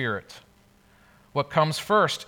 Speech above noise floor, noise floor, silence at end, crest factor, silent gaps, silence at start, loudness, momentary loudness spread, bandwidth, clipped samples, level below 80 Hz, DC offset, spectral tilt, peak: 33 dB; -58 dBFS; 0.05 s; 20 dB; none; 0 s; -25 LUFS; 12 LU; over 20 kHz; under 0.1%; -64 dBFS; under 0.1%; -4.5 dB/octave; -6 dBFS